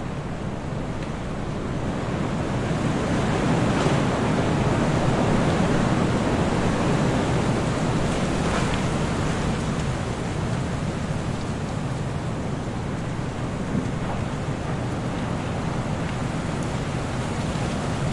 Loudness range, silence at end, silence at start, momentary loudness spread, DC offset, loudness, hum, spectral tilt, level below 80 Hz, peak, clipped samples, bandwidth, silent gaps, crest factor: 6 LU; 0 s; 0 s; 7 LU; under 0.1%; -25 LUFS; none; -6 dB/octave; -36 dBFS; -6 dBFS; under 0.1%; 11.5 kHz; none; 18 dB